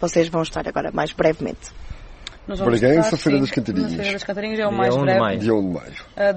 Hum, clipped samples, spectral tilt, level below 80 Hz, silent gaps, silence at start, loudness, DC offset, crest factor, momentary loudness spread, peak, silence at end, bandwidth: none; under 0.1%; -6 dB/octave; -42 dBFS; none; 0 s; -20 LUFS; under 0.1%; 18 dB; 19 LU; -2 dBFS; 0 s; 8.8 kHz